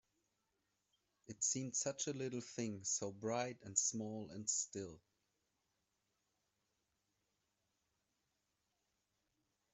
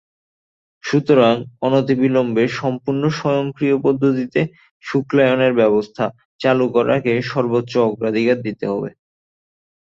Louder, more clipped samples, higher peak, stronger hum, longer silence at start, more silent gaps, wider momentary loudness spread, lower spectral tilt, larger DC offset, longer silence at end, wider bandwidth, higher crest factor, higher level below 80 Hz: second, -41 LUFS vs -18 LUFS; neither; second, -22 dBFS vs -2 dBFS; neither; first, 1.3 s vs 0.85 s; second, none vs 4.71-4.80 s, 6.25-6.39 s; about the same, 9 LU vs 9 LU; second, -3 dB/octave vs -7 dB/octave; neither; first, 4.75 s vs 1 s; about the same, 8.2 kHz vs 7.6 kHz; first, 26 dB vs 16 dB; second, -84 dBFS vs -58 dBFS